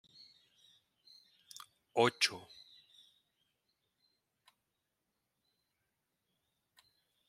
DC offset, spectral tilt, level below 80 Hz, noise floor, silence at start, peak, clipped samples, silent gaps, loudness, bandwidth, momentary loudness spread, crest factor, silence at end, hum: under 0.1%; -3 dB/octave; -88 dBFS; -86 dBFS; 1.95 s; -14 dBFS; under 0.1%; none; -33 LUFS; 16 kHz; 28 LU; 30 dB; 4.9 s; none